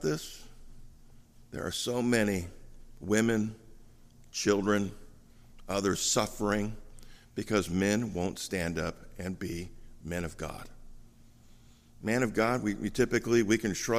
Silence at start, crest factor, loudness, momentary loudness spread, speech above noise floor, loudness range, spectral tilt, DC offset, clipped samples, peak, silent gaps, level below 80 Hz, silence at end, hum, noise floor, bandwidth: 0 s; 20 dB; -31 LUFS; 15 LU; 26 dB; 6 LU; -4.5 dB/octave; under 0.1%; under 0.1%; -12 dBFS; none; -52 dBFS; 0 s; none; -56 dBFS; 15.5 kHz